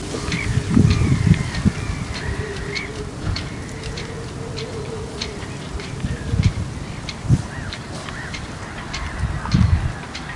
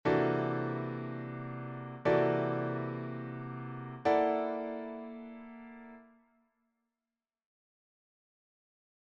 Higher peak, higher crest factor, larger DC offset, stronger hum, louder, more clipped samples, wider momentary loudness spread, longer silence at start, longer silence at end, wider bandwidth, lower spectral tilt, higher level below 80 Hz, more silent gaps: first, 0 dBFS vs -16 dBFS; about the same, 22 dB vs 20 dB; neither; neither; first, -23 LUFS vs -34 LUFS; neither; second, 13 LU vs 19 LU; about the same, 0 s vs 0.05 s; second, 0 s vs 3 s; first, 11.5 kHz vs 7.2 kHz; second, -6 dB/octave vs -8.5 dB/octave; first, -32 dBFS vs -70 dBFS; neither